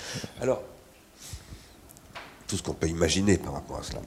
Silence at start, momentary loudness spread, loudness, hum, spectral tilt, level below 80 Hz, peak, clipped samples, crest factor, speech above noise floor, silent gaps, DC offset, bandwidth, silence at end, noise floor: 0 s; 23 LU; -29 LUFS; none; -4.5 dB/octave; -48 dBFS; -8 dBFS; under 0.1%; 22 dB; 24 dB; none; under 0.1%; 16 kHz; 0 s; -52 dBFS